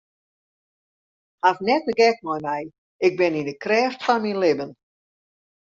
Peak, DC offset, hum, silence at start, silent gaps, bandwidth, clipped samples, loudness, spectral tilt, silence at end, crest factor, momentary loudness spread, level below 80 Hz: -4 dBFS; under 0.1%; none; 1.45 s; 2.78-2.99 s; 7.4 kHz; under 0.1%; -22 LUFS; -5 dB/octave; 1.05 s; 20 dB; 9 LU; -68 dBFS